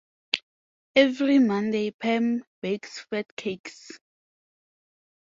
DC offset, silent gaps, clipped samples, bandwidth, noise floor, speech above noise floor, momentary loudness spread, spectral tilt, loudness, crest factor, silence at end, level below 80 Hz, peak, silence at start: under 0.1%; 0.43-0.94 s, 1.94-1.99 s, 2.47-2.62 s, 3.31-3.37 s, 3.60-3.64 s; under 0.1%; 7.6 kHz; under -90 dBFS; over 65 dB; 15 LU; -5 dB/octave; -25 LUFS; 26 dB; 1.25 s; -72 dBFS; -2 dBFS; 0.35 s